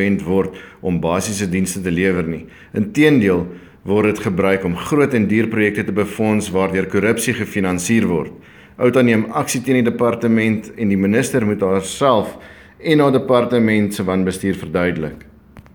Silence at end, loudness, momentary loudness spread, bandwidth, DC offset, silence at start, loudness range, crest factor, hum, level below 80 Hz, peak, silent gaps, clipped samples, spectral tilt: 0.15 s; -17 LUFS; 8 LU; over 20 kHz; under 0.1%; 0 s; 2 LU; 16 dB; none; -48 dBFS; 0 dBFS; none; under 0.1%; -6 dB/octave